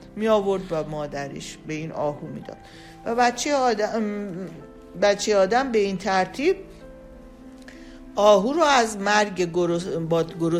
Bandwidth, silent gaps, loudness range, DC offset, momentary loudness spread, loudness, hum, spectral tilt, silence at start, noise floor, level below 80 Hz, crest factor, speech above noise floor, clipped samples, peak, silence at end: 15 kHz; none; 4 LU; under 0.1%; 19 LU; -23 LUFS; none; -4.5 dB/octave; 0 s; -44 dBFS; -52 dBFS; 18 dB; 21 dB; under 0.1%; -4 dBFS; 0 s